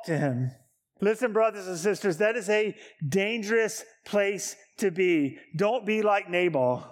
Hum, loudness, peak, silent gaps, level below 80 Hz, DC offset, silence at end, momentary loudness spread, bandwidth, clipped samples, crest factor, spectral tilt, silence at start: none; -27 LUFS; -12 dBFS; none; -76 dBFS; under 0.1%; 0 s; 8 LU; 16.5 kHz; under 0.1%; 16 dB; -5 dB/octave; 0 s